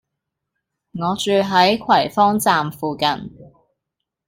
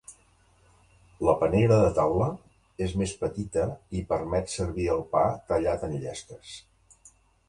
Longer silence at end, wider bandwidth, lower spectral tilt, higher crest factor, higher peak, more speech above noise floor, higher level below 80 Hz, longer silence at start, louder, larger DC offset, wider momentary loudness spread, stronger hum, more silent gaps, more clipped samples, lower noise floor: about the same, 0.85 s vs 0.9 s; first, 16.5 kHz vs 11.5 kHz; second, -4.5 dB/octave vs -6.5 dB/octave; about the same, 18 dB vs 20 dB; first, -2 dBFS vs -8 dBFS; first, 63 dB vs 36 dB; second, -56 dBFS vs -46 dBFS; first, 0.95 s vs 0.1 s; first, -17 LUFS vs -27 LUFS; neither; second, 12 LU vs 18 LU; neither; neither; neither; first, -81 dBFS vs -62 dBFS